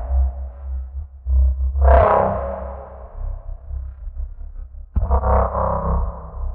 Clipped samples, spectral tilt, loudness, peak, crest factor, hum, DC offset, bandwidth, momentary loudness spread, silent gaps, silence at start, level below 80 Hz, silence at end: under 0.1%; -8.5 dB/octave; -20 LUFS; -2 dBFS; 18 dB; none; under 0.1%; 3 kHz; 20 LU; none; 0 s; -22 dBFS; 0 s